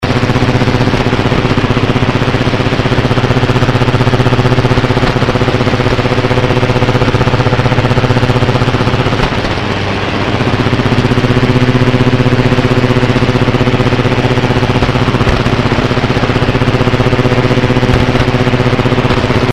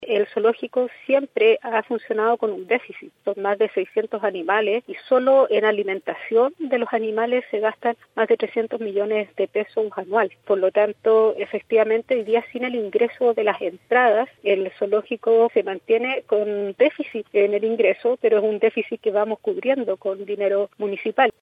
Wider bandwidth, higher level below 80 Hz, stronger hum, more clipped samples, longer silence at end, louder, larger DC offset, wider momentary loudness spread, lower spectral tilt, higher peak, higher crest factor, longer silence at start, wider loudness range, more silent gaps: first, 11 kHz vs 4.9 kHz; first, -22 dBFS vs -76 dBFS; neither; first, 1% vs under 0.1%; about the same, 0 s vs 0.1 s; first, -11 LUFS vs -21 LUFS; first, 0.3% vs under 0.1%; second, 2 LU vs 8 LU; about the same, -6.5 dB/octave vs -7 dB/octave; first, 0 dBFS vs -6 dBFS; second, 10 dB vs 16 dB; about the same, 0 s vs 0 s; about the same, 1 LU vs 3 LU; neither